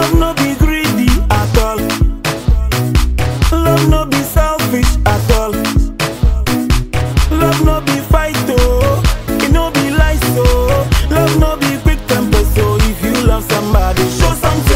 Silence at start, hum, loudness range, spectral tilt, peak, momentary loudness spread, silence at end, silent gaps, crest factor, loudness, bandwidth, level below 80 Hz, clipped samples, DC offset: 0 s; none; 1 LU; -5.5 dB/octave; 0 dBFS; 4 LU; 0 s; none; 10 dB; -13 LUFS; 16.5 kHz; -16 dBFS; under 0.1%; under 0.1%